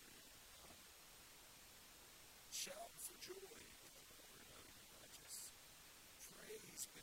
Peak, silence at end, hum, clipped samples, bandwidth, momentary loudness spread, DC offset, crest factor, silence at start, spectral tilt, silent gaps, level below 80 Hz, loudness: -34 dBFS; 0 s; none; under 0.1%; 16.5 kHz; 10 LU; under 0.1%; 24 dB; 0 s; -1 dB/octave; none; -78 dBFS; -56 LUFS